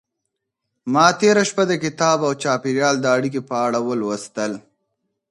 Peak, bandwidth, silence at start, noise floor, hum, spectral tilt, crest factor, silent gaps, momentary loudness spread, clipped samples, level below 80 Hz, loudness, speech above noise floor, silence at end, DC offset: 0 dBFS; 11.5 kHz; 0.85 s; -78 dBFS; none; -4 dB/octave; 20 dB; none; 10 LU; under 0.1%; -66 dBFS; -19 LUFS; 60 dB; 0.7 s; under 0.1%